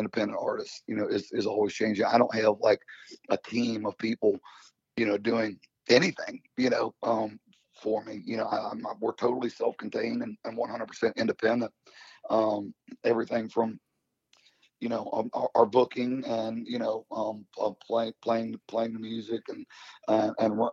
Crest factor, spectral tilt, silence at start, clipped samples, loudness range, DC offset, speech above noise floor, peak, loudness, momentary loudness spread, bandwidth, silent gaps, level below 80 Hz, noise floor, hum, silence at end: 22 dB; -5.5 dB/octave; 0 s; under 0.1%; 4 LU; under 0.1%; 42 dB; -8 dBFS; -29 LUFS; 12 LU; 7.8 kHz; none; -76 dBFS; -70 dBFS; none; 0 s